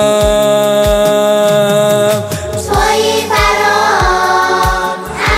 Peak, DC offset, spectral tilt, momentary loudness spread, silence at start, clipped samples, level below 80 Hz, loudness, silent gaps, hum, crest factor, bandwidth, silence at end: 0 dBFS; under 0.1%; -4 dB/octave; 6 LU; 0 s; under 0.1%; -26 dBFS; -11 LUFS; none; none; 10 dB; 16.5 kHz; 0 s